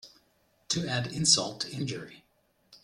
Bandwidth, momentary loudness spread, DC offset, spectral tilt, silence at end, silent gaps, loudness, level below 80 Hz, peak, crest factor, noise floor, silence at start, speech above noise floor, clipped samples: 15.5 kHz; 15 LU; under 0.1%; -2.5 dB/octave; 0.05 s; none; -28 LUFS; -64 dBFS; -8 dBFS; 24 dB; -69 dBFS; 0.05 s; 39 dB; under 0.1%